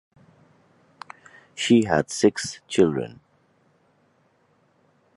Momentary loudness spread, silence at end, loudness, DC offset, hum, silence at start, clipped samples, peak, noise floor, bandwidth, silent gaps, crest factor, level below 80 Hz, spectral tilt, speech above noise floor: 25 LU; 2.1 s; -22 LUFS; under 0.1%; none; 1.55 s; under 0.1%; -4 dBFS; -64 dBFS; 11.5 kHz; none; 22 dB; -58 dBFS; -5 dB/octave; 43 dB